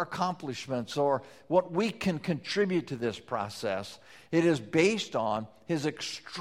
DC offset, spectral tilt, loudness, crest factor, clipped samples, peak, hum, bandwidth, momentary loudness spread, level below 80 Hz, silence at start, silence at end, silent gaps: under 0.1%; -5.5 dB/octave; -30 LUFS; 20 dB; under 0.1%; -10 dBFS; none; 14.5 kHz; 9 LU; -66 dBFS; 0 s; 0 s; none